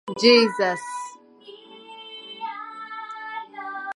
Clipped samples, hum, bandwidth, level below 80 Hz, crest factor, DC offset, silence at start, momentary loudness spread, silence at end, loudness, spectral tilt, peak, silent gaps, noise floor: under 0.1%; none; 11.5 kHz; -78 dBFS; 24 dB; under 0.1%; 0.05 s; 25 LU; 0.05 s; -22 LUFS; -3.5 dB/octave; -2 dBFS; none; -47 dBFS